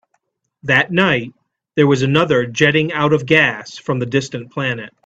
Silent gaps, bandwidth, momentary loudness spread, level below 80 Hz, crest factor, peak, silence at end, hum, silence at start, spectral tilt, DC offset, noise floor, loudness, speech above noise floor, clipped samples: none; 8.2 kHz; 11 LU; -54 dBFS; 16 dB; 0 dBFS; 0.2 s; none; 0.65 s; -5.5 dB/octave; under 0.1%; -68 dBFS; -16 LUFS; 52 dB; under 0.1%